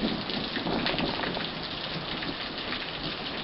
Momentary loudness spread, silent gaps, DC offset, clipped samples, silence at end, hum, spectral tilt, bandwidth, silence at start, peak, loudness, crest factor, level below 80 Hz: 5 LU; none; under 0.1%; under 0.1%; 0 s; none; -2 dB/octave; 6 kHz; 0 s; -10 dBFS; -31 LUFS; 22 dB; -50 dBFS